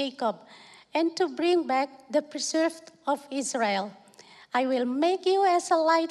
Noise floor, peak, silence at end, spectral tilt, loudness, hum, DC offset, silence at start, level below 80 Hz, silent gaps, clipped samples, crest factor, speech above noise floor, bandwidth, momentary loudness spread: -53 dBFS; -10 dBFS; 0 s; -3 dB/octave; -27 LUFS; none; under 0.1%; 0 s; -84 dBFS; none; under 0.1%; 16 dB; 27 dB; 12 kHz; 8 LU